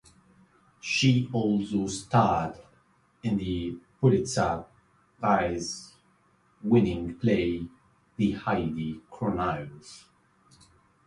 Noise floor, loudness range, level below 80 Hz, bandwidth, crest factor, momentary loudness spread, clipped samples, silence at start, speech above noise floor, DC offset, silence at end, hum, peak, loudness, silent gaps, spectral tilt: -65 dBFS; 3 LU; -52 dBFS; 11.5 kHz; 20 dB; 14 LU; under 0.1%; 0.85 s; 38 dB; under 0.1%; 1.05 s; none; -8 dBFS; -27 LUFS; none; -6 dB/octave